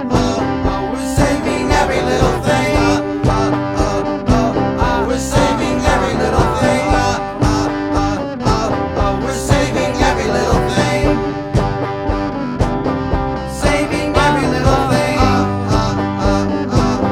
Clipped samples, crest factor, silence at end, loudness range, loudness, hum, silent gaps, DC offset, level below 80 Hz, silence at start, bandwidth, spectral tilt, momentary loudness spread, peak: under 0.1%; 14 dB; 0 s; 2 LU; -16 LUFS; none; none; under 0.1%; -24 dBFS; 0 s; 16.5 kHz; -5.5 dB/octave; 5 LU; 0 dBFS